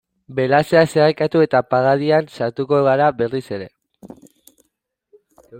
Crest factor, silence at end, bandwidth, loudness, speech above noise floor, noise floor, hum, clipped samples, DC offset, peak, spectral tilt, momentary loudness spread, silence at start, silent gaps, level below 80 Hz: 16 dB; 0 s; 16.5 kHz; -17 LUFS; 56 dB; -73 dBFS; none; under 0.1%; under 0.1%; -2 dBFS; -6.5 dB/octave; 13 LU; 0.3 s; none; -60 dBFS